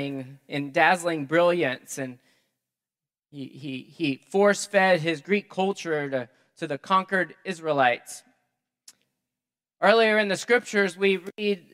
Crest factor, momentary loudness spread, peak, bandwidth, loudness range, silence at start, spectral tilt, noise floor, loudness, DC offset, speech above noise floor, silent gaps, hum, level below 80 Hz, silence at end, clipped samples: 24 dB; 16 LU; -2 dBFS; 15.5 kHz; 4 LU; 0 s; -4.5 dB/octave; under -90 dBFS; -24 LUFS; under 0.1%; over 65 dB; none; none; -82 dBFS; 0.15 s; under 0.1%